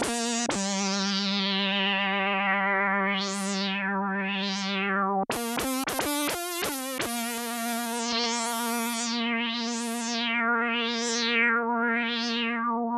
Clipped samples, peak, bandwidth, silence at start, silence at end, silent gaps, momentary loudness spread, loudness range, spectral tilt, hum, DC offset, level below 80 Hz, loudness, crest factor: under 0.1%; -10 dBFS; 15.5 kHz; 0 s; 0 s; none; 5 LU; 3 LU; -2.5 dB/octave; none; under 0.1%; -64 dBFS; -27 LUFS; 16 dB